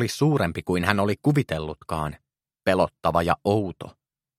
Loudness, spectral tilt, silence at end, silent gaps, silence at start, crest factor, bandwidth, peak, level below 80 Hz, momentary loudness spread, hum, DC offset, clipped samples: -24 LUFS; -6.5 dB/octave; 0.5 s; none; 0 s; 24 dB; 15.5 kHz; -2 dBFS; -48 dBFS; 10 LU; none; under 0.1%; under 0.1%